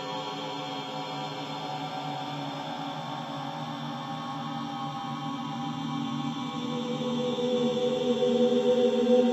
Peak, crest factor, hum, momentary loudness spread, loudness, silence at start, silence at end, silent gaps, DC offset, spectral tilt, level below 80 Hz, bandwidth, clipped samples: -10 dBFS; 18 dB; none; 11 LU; -30 LUFS; 0 s; 0 s; none; under 0.1%; -6 dB/octave; -76 dBFS; 12.5 kHz; under 0.1%